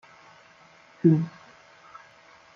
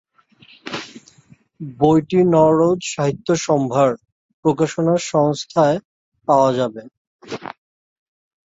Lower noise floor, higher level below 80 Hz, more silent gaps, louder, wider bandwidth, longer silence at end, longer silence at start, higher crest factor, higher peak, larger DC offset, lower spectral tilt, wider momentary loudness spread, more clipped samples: about the same, -55 dBFS vs -52 dBFS; second, -74 dBFS vs -56 dBFS; second, none vs 4.12-4.43 s, 5.85-6.12 s, 6.97-7.19 s; second, -24 LUFS vs -17 LUFS; second, 6.8 kHz vs 8 kHz; first, 1.25 s vs 0.95 s; first, 1.05 s vs 0.65 s; about the same, 22 dB vs 18 dB; second, -8 dBFS vs -2 dBFS; neither; first, -10 dB/octave vs -6 dB/octave; first, 27 LU vs 19 LU; neither